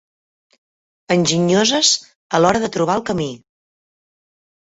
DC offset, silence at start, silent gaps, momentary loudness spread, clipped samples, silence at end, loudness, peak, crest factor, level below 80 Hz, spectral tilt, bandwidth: under 0.1%; 1.1 s; 2.15-2.30 s; 9 LU; under 0.1%; 1.3 s; -17 LUFS; 0 dBFS; 20 dB; -54 dBFS; -3.5 dB/octave; 8.4 kHz